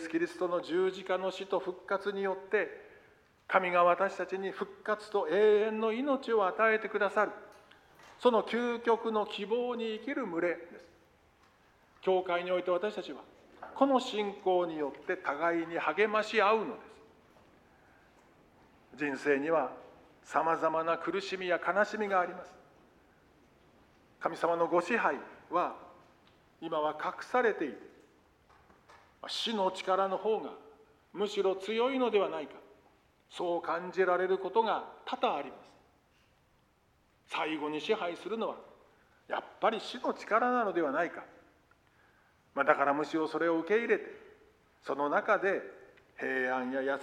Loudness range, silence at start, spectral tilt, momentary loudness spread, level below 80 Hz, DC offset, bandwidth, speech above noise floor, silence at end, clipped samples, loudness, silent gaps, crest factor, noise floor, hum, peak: 6 LU; 0 s; -5 dB/octave; 11 LU; -76 dBFS; under 0.1%; 11.5 kHz; 38 dB; 0 s; under 0.1%; -32 LUFS; none; 24 dB; -69 dBFS; none; -10 dBFS